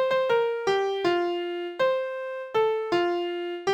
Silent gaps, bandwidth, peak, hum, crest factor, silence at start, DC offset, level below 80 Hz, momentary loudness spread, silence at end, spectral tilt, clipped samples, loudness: none; 9.2 kHz; -12 dBFS; none; 14 dB; 0 s; under 0.1%; -70 dBFS; 7 LU; 0 s; -4.5 dB/octave; under 0.1%; -26 LUFS